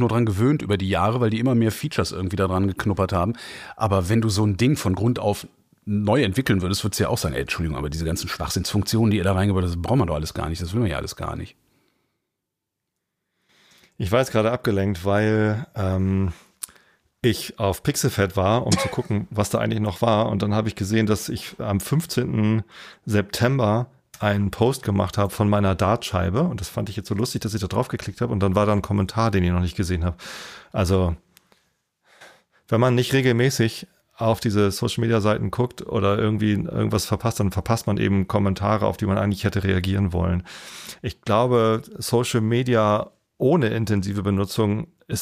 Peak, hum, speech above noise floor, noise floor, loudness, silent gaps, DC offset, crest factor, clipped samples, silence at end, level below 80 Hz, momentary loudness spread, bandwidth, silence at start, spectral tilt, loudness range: -4 dBFS; none; 60 dB; -82 dBFS; -22 LUFS; none; under 0.1%; 18 dB; under 0.1%; 0 s; -42 dBFS; 9 LU; 15.5 kHz; 0 s; -6 dB/octave; 3 LU